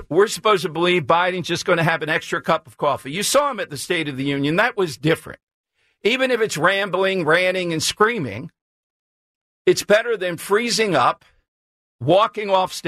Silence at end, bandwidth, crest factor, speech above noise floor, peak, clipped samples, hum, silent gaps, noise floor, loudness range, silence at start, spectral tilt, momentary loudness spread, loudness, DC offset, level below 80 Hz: 0 s; 14 kHz; 16 dB; over 71 dB; -4 dBFS; under 0.1%; none; 5.43-5.47 s, 5.53-5.64 s, 8.61-9.65 s, 11.48-11.99 s; under -90 dBFS; 2 LU; 0 s; -4 dB/octave; 6 LU; -19 LUFS; under 0.1%; -58 dBFS